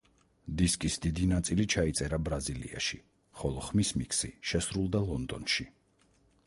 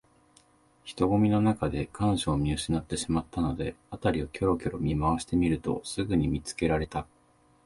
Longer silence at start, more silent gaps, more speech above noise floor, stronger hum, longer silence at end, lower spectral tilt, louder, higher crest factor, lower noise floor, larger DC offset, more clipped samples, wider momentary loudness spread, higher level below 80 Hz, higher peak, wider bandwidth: second, 0.45 s vs 0.85 s; neither; about the same, 36 dB vs 35 dB; neither; first, 0.75 s vs 0.6 s; second, -4.5 dB/octave vs -6 dB/octave; second, -32 LUFS vs -29 LUFS; about the same, 18 dB vs 16 dB; first, -68 dBFS vs -63 dBFS; neither; neither; about the same, 8 LU vs 9 LU; about the same, -44 dBFS vs -44 dBFS; about the same, -14 dBFS vs -12 dBFS; about the same, 12 kHz vs 11.5 kHz